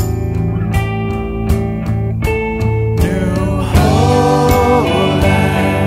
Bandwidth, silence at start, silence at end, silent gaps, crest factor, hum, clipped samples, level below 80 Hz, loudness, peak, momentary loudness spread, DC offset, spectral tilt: 16 kHz; 0 s; 0 s; none; 12 dB; none; under 0.1%; -22 dBFS; -14 LUFS; 0 dBFS; 7 LU; under 0.1%; -6.5 dB/octave